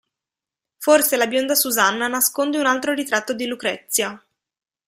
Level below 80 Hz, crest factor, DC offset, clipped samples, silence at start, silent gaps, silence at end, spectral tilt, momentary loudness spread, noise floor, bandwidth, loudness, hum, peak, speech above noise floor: -68 dBFS; 18 dB; under 0.1%; under 0.1%; 0.8 s; none; 0.7 s; -1 dB/octave; 9 LU; -88 dBFS; 16 kHz; -19 LUFS; none; -2 dBFS; 68 dB